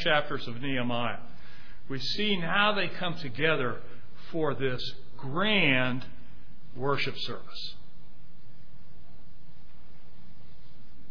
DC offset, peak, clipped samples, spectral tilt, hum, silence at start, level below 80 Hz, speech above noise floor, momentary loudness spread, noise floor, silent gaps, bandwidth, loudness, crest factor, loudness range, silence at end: 4%; -10 dBFS; under 0.1%; -6 dB/octave; none; 0 s; -56 dBFS; 25 dB; 17 LU; -55 dBFS; none; 5.4 kHz; -29 LUFS; 22 dB; 9 LU; 0.1 s